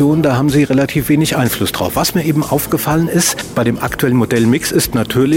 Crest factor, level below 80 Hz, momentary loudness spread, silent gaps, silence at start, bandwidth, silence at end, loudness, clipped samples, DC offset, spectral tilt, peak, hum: 10 dB; -38 dBFS; 4 LU; none; 0 s; 16.5 kHz; 0 s; -14 LUFS; under 0.1%; under 0.1%; -5 dB/octave; -2 dBFS; none